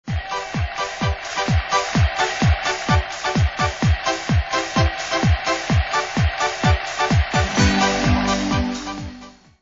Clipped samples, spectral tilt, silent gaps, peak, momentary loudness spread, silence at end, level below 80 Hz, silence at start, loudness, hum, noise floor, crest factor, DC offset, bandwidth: under 0.1%; -5 dB/octave; none; -4 dBFS; 7 LU; 0.3 s; -28 dBFS; 0.05 s; -20 LUFS; none; -41 dBFS; 16 dB; under 0.1%; 8 kHz